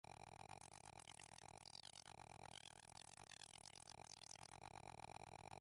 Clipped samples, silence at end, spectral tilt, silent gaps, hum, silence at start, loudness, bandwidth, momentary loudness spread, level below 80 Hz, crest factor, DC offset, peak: under 0.1%; 0 s; -2 dB/octave; none; none; 0.05 s; -60 LUFS; 11.5 kHz; 2 LU; -78 dBFS; 20 dB; under 0.1%; -40 dBFS